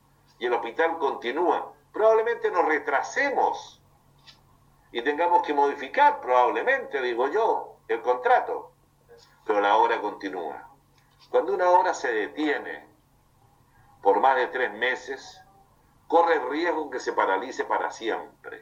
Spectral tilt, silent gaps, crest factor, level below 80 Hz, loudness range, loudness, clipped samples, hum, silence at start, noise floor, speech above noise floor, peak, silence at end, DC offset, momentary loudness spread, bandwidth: -3 dB/octave; none; 18 dB; -68 dBFS; 3 LU; -25 LUFS; under 0.1%; none; 0.4 s; -61 dBFS; 37 dB; -8 dBFS; 0 s; under 0.1%; 12 LU; 8.4 kHz